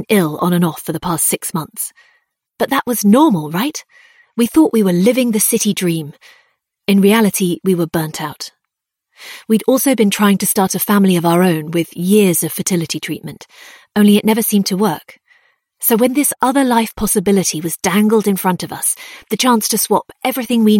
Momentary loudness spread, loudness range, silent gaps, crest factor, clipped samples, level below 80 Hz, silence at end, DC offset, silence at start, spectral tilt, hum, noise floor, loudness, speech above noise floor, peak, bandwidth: 12 LU; 3 LU; none; 16 dB; under 0.1%; -50 dBFS; 0 s; under 0.1%; 0 s; -4.5 dB/octave; none; -78 dBFS; -15 LUFS; 63 dB; 0 dBFS; 17 kHz